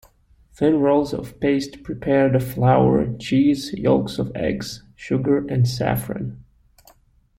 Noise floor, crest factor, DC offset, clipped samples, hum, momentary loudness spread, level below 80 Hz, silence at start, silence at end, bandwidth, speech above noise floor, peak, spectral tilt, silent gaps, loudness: -56 dBFS; 18 dB; under 0.1%; under 0.1%; none; 12 LU; -46 dBFS; 0.6 s; 0.95 s; 16.5 kHz; 37 dB; -4 dBFS; -7 dB/octave; none; -20 LUFS